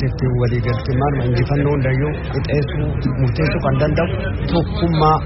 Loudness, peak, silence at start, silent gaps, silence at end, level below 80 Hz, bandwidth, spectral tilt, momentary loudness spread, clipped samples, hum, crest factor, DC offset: -18 LUFS; -2 dBFS; 0 s; none; 0 s; -28 dBFS; 6 kHz; -7 dB/octave; 4 LU; under 0.1%; none; 16 dB; under 0.1%